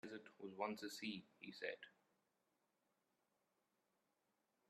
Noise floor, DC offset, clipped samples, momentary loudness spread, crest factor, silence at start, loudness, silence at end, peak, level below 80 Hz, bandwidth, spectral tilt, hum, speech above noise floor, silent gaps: -87 dBFS; under 0.1%; under 0.1%; 10 LU; 26 dB; 0.05 s; -51 LUFS; 2.8 s; -30 dBFS; under -90 dBFS; 13 kHz; -4 dB/octave; none; 36 dB; none